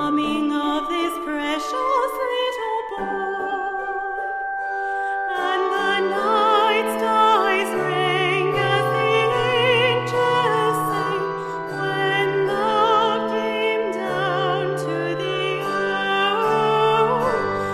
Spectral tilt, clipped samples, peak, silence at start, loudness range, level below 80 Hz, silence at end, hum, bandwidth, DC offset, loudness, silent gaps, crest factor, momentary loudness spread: -5 dB/octave; under 0.1%; -6 dBFS; 0 s; 5 LU; -58 dBFS; 0 s; none; 15.5 kHz; under 0.1%; -21 LUFS; none; 14 dB; 8 LU